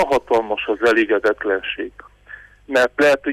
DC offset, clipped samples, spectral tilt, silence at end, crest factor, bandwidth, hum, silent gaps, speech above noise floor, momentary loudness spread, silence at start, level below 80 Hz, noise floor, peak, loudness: under 0.1%; under 0.1%; -4 dB/octave; 0 s; 14 dB; 15 kHz; 50 Hz at -55 dBFS; none; 24 dB; 9 LU; 0 s; -50 dBFS; -42 dBFS; -6 dBFS; -18 LUFS